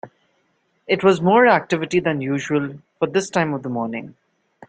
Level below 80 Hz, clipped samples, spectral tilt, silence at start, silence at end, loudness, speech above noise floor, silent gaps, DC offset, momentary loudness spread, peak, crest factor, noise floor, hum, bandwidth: -62 dBFS; under 0.1%; -6 dB/octave; 0.05 s; 0.6 s; -19 LUFS; 47 dB; none; under 0.1%; 12 LU; -2 dBFS; 18 dB; -66 dBFS; none; 9.2 kHz